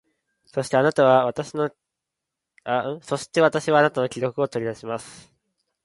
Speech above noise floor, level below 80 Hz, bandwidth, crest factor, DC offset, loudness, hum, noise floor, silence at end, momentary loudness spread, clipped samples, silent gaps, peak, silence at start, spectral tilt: 63 dB; -66 dBFS; 11.5 kHz; 20 dB; under 0.1%; -22 LUFS; none; -84 dBFS; 0.7 s; 14 LU; under 0.1%; none; -4 dBFS; 0.55 s; -5.5 dB/octave